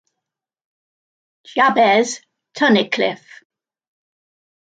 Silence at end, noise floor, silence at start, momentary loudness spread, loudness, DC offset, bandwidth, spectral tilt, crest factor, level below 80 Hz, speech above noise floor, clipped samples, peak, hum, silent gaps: 1.5 s; -83 dBFS; 1.55 s; 18 LU; -16 LUFS; under 0.1%; 9.2 kHz; -3.5 dB/octave; 20 dB; -72 dBFS; 68 dB; under 0.1%; -2 dBFS; none; none